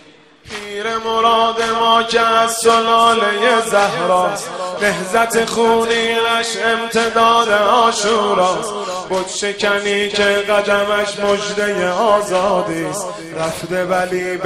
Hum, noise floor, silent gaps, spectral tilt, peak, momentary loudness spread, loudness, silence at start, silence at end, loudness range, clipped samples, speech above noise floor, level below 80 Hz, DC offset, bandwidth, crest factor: none; -43 dBFS; none; -2.5 dB/octave; 0 dBFS; 9 LU; -15 LUFS; 0.45 s; 0 s; 3 LU; under 0.1%; 28 dB; -50 dBFS; under 0.1%; 16 kHz; 16 dB